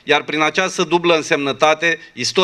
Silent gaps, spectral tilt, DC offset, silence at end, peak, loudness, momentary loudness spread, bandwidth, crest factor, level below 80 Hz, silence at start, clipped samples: none; -3 dB/octave; under 0.1%; 0 s; 0 dBFS; -16 LUFS; 4 LU; 12.5 kHz; 16 dB; -60 dBFS; 0.05 s; under 0.1%